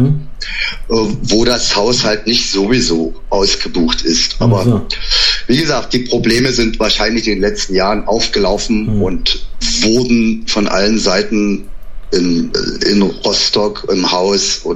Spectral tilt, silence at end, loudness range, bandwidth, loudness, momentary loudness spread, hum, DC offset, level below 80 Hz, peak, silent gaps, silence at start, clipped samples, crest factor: -4 dB/octave; 0 s; 1 LU; 14 kHz; -13 LUFS; 5 LU; none; under 0.1%; -26 dBFS; 0 dBFS; none; 0 s; under 0.1%; 12 dB